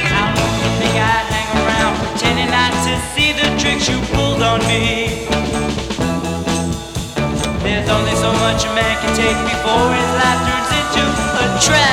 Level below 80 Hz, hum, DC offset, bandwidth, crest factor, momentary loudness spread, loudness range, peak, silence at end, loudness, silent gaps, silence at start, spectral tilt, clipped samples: -30 dBFS; none; under 0.1%; 16.5 kHz; 14 dB; 5 LU; 3 LU; -2 dBFS; 0 s; -15 LUFS; none; 0 s; -4 dB/octave; under 0.1%